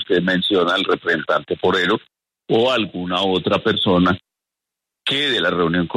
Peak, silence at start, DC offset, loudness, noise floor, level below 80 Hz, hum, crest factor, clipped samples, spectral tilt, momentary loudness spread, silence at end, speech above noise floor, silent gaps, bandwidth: -4 dBFS; 0 s; under 0.1%; -18 LUFS; -85 dBFS; -54 dBFS; none; 14 dB; under 0.1%; -5.5 dB/octave; 5 LU; 0 s; 67 dB; none; 12 kHz